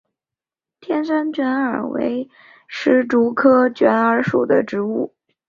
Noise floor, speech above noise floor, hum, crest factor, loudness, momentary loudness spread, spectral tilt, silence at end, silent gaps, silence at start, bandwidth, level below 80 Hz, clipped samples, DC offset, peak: -89 dBFS; 72 dB; none; 16 dB; -18 LUFS; 11 LU; -7 dB/octave; 0.4 s; none; 0.85 s; 7.2 kHz; -62 dBFS; under 0.1%; under 0.1%; -2 dBFS